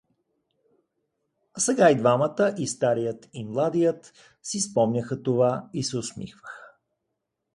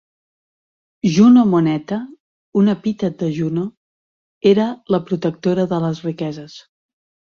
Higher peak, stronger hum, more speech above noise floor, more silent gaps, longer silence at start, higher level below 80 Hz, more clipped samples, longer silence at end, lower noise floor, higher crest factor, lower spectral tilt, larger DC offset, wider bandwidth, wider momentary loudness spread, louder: second, -6 dBFS vs -2 dBFS; neither; second, 56 dB vs over 74 dB; second, none vs 2.20-2.52 s, 3.77-4.41 s; first, 1.55 s vs 1.05 s; second, -66 dBFS vs -58 dBFS; neither; first, 0.9 s vs 0.75 s; second, -81 dBFS vs under -90 dBFS; about the same, 20 dB vs 16 dB; second, -5 dB/octave vs -7.5 dB/octave; neither; first, 11.5 kHz vs 7 kHz; first, 20 LU vs 15 LU; second, -24 LUFS vs -17 LUFS